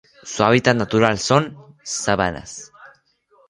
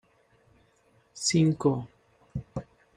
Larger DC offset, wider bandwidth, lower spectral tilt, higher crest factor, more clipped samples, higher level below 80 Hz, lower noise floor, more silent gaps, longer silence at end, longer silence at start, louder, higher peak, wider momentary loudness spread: neither; about the same, 11.5 kHz vs 11.5 kHz; about the same, -4.5 dB/octave vs -5 dB/octave; about the same, 20 dB vs 20 dB; neither; first, -48 dBFS vs -58 dBFS; second, -58 dBFS vs -65 dBFS; neither; first, 0.6 s vs 0.35 s; second, 0.25 s vs 1.15 s; first, -18 LUFS vs -27 LUFS; first, 0 dBFS vs -12 dBFS; about the same, 18 LU vs 20 LU